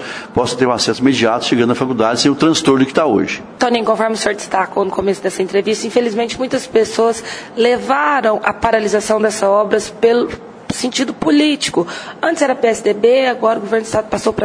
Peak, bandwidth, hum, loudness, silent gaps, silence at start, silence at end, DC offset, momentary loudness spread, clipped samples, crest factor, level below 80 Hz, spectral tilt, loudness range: 0 dBFS; 10.5 kHz; none; -15 LUFS; none; 0 s; 0 s; under 0.1%; 6 LU; under 0.1%; 14 dB; -48 dBFS; -4 dB/octave; 3 LU